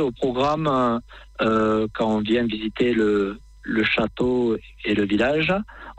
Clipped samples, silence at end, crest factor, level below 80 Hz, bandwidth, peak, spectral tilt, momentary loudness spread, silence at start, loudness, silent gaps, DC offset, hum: under 0.1%; 0.05 s; 14 dB; -46 dBFS; 8.6 kHz; -10 dBFS; -6.5 dB/octave; 7 LU; 0 s; -22 LUFS; none; under 0.1%; none